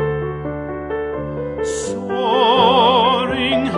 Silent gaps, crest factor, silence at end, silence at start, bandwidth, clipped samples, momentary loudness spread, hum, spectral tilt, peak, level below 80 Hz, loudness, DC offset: none; 16 dB; 0 s; 0 s; 11 kHz; under 0.1%; 13 LU; none; -4.5 dB/octave; -2 dBFS; -42 dBFS; -17 LUFS; under 0.1%